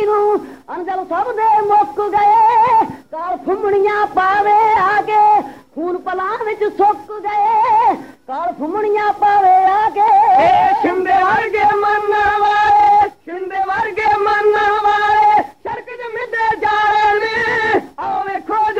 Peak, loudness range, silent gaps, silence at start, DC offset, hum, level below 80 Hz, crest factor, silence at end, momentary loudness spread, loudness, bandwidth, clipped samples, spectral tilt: -4 dBFS; 4 LU; none; 0 s; 0.2%; none; -50 dBFS; 10 dB; 0 s; 12 LU; -14 LUFS; 8.4 kHz; under 0.1%; -5 dB/octave